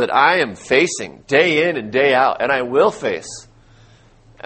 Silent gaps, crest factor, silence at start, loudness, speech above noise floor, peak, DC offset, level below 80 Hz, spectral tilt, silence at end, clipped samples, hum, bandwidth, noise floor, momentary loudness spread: none; 18 dB; 0 s; -16 LUFS; 32 dB; 0 dBFS; under 0.1%; -56 dBFS; -3.5 dB/octave; 1.05 s; under 0.1%; none; 8.8 kHz; -49 dBFS; 12 LU